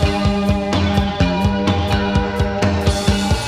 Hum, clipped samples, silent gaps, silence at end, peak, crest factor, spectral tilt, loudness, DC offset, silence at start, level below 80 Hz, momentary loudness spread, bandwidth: none; under 0.1%; none; 0 s; -2 dBFS; 16 dB; -6 dB/octave; -17 LUFS; under 0.1%; 0 s; -26 dBFS; 1 LU; 15 kHz